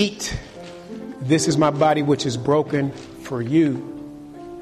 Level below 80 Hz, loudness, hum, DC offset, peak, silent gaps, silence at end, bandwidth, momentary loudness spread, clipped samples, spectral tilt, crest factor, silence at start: -48 dBFS; -21 LUFS; none; under 0.1%; -4 dBFS; none; 0 s; 13 kHz; 20 LU; under 0.1%; -5.5 dB/octave; 16 dB; 0 s